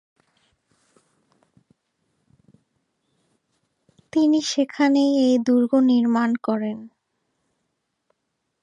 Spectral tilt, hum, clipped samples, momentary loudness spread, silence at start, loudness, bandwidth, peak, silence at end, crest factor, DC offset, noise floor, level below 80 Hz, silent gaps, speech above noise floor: -4.5 dB/octave; none; under 0.1%; 9 LU; 4.15 s; -20 LUFS; 9.2 kHz; -8 dBFS; 1.75 s; 16 dB; under 0.1%; -77 dBFS; -74 dBFS; none; 58 dB